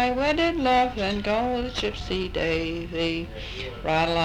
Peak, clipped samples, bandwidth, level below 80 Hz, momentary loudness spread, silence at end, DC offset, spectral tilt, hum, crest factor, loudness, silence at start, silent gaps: -8 dBFS; under 0.1%; 14 kHz; -40 dBFS; 10 LU; 0 s; under 0.1%; -5.5 dB/octave; none; 16 dB; -25 LUFS; 0 s; none